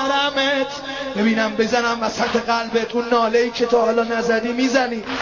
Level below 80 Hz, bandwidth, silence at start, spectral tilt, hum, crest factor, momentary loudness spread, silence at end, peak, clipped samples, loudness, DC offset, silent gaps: -52 dBFS; 7.4 kHz; 0 s; -3.5 dB/octave; none; 16 dB; 4 LU; 0 s; -4 dBFS; under 0.1%; -19 LUFS; under 0.1%; none